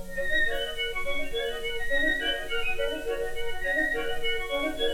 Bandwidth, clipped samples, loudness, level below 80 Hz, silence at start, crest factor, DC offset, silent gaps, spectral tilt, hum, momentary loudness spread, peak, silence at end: 16.5 kHz; under 0.1%; -28 LUFS; -38 dBFS; 0 s; 14 dB; under 0.1%; none; -3 dB/octave; none; 6 LU; -14 dBFS; 0 s